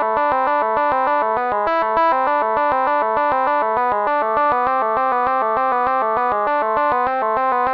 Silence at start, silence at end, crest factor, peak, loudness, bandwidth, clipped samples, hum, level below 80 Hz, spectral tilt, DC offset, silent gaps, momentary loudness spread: 0 s; 0 s; 12 dB; -6 dBFS; -18 LUFS; 5.8 kHz; under 0.1%; none; -52 dBFS; -7 dB/octave; 0.1%; none; 2 LU